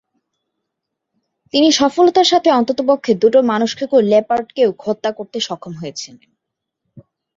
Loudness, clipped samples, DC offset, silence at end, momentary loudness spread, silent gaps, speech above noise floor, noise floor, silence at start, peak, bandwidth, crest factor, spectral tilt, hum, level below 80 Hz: -15 LUFS; under 0.1%; under 0.1%; 0.35 s; 15 LU; none; 64 dB; -79 dBFS; 1.55 s; -2 dBFS; 7.8 kHz; 16 dB; -4 dB/octave; none; -60 dBFS